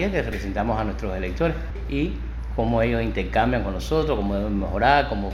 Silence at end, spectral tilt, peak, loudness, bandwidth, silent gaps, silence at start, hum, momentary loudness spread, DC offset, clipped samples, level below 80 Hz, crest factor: 0 s; -7 dB/octave; -2 dBFS; -24 LUFS; 12.5 kHz; none; 0 s; none; 9 LU; under 0.1%; under 0.1%; -30 dBFS; 20 dB